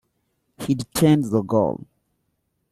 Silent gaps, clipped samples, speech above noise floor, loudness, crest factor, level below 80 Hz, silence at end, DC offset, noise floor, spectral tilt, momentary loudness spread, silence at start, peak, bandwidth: none; under 0.1%; 53 dB; -21 LUFS; 18 dB; -54 dBFS; 1 s; under 0.1%; -73 dBFS; -6.5 dB/octave; 13 LU; 0.6 s; -6 dBFS; 15.5 kHz